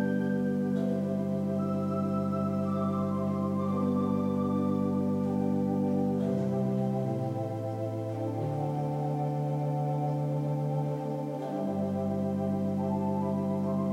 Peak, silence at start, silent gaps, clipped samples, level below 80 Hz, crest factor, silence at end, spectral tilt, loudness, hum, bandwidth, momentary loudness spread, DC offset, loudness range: -18 dBFS; 0 s; none; under 0.1%; -68 dBFS; 12 dB; 0 s; -9.5 dB/octave; -30 LUFS; none; 9.6 kHz; 4 LU; under 0.1%; 3 LU